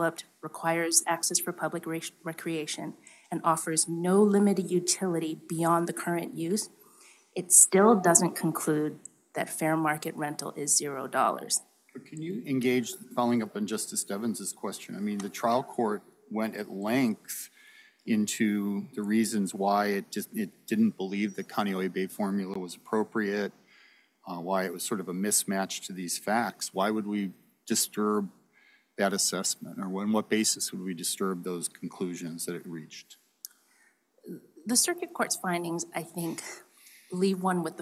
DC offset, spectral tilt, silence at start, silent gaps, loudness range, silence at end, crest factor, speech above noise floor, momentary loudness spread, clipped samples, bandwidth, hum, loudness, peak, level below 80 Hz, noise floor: under 0.1%; -3.5 dB/octave; 0 s; none; 8 LU; 0 s; 26 dB; 37 dB; 14 LU; under 0.1%; 16 kHz; none; -28 LUFS; -4 dBFS; -84 dBFS; -66 dBFS